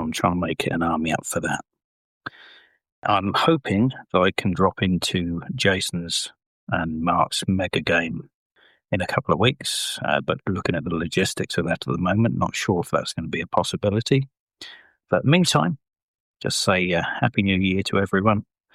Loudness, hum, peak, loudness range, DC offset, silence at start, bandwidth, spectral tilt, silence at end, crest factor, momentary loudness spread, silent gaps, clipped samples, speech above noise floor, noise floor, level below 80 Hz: -22 LUFS; none; -4 dBFS; 3 LU; under 0.1%; 0 s; 15 kHz; -5 dB/octave; 0.35 s; 18 dB; 9 LU; 1.84-2.21 s, 2.92-3.02 s, 6.46-6.67 s, 8.34-8.50 s, 14.40-14.47 s, 16.02-16.34 s; under 0.1%; 29 dB; -51 dBFS; -52 dBFS